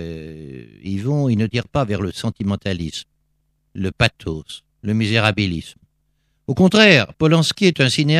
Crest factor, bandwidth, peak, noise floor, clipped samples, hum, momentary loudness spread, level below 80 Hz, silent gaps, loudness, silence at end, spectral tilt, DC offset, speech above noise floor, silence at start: 18 dB; 14 kHz; 0 dBFS; -66 dBFS; under 0.1%; none; 21 LU; -46 dBFS; none; -18 LUFS; 0 s; -5.5 dB/octave; under 0.1%; 49 dB; 0 s